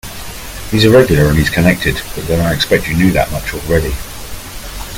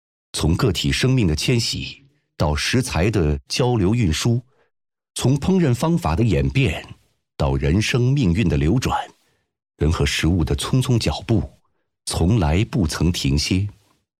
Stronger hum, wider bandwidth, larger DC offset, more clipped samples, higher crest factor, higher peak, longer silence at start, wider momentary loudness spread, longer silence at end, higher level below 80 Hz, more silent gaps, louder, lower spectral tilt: neither; first, 17.5 kHz vs 15 kHz; neither; neither; about the same, 14 dB vs 12 dB; first, 0 dBFS vs -8 dBFS; second, 0.05 s vs 0.35 s; first, 18 LU vs 7 LU; second, 0 s vs 0.5 s; first, -26 dBFS vs -34 dBFS; neither; first, -13 LUFS vs -20 LUFS; about the same, -5.5 dB/octave vs -5.5 dB/octave